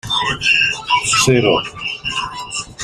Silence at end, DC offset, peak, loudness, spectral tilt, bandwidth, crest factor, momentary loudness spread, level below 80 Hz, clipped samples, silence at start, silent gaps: 0 s; under 0.1%; -2 dBFS; -15 LUFS; -2.5 dB/octave; 16 kHz; 16 dB; 11 LU; -44 dBFS; under 0.1%; 0.05 s; none